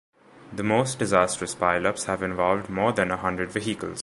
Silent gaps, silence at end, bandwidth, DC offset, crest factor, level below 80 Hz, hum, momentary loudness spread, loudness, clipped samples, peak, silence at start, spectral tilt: none; 0 s; 11.5 kHz; under 0.1%; 22 dB; -52 dBFS; none; 6 LU; -25 LUFS; under 0.1%; -4 dBFS; 0.35 s; -4.5 dB/octave